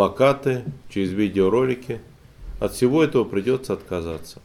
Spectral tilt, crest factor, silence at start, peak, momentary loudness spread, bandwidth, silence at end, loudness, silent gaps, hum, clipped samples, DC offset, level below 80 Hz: -6.5 dB/octave; 18 dB; 0 s; -4 dBFS; 12 LU; 15.5 kHz; 0.1 s; -22 LUFS; none; none; under 0.1%; under 0.1%; -44 dBFS